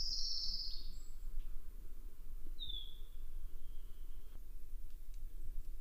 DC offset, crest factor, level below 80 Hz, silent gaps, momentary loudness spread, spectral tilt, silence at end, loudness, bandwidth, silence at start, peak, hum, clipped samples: under 0.1%; 14 dB; -44 dBFS; none; 18 LU; -2 dB/octave; 0 s; -48 LUFS; 15.5 kHz; 0 s; -26 dBFS; none; under 0.1%